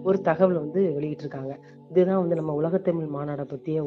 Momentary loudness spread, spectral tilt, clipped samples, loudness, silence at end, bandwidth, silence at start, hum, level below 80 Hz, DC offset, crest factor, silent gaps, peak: 12 LU; -10 dB/octave; under 0.1%; -25 LUFS; 0 s; 6 kHz; 0 s; none; -66 dBFS; under 0.1%; 18 dB; none; -8 dBFS